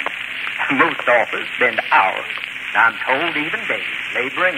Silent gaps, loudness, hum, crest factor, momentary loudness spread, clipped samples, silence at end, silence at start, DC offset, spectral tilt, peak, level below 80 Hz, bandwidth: none; -18 LUFS; none; 16 dB; 8 LU; under 0.1%; 0 s; 0 s; under 0.1%; -3.5 dB/octave; -2 dBFS; -62 dBFS; 16 kHz